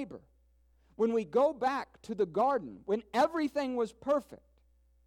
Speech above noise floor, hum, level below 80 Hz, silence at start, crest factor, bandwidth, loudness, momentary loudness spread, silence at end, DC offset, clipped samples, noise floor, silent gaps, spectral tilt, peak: 35 dB; none; -66 dBFS; 0 s; 16 dB; 15.5 kHz; -32 LUFS; 8 LU; 0.7 s; under 0.1%; under 0.1%; -67 dBFS; none; -5.5 dB/octave; -16 dBFS